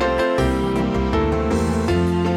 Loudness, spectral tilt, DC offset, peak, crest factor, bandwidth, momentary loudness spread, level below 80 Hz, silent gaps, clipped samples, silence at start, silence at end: -20 LUFS; -7 dB/octave; under 0.1%; -6 dBFS; 12 dB; 15.5 kHz; 2 LU; -28 dBFS; none; under 0.1%; 0 s; 0 s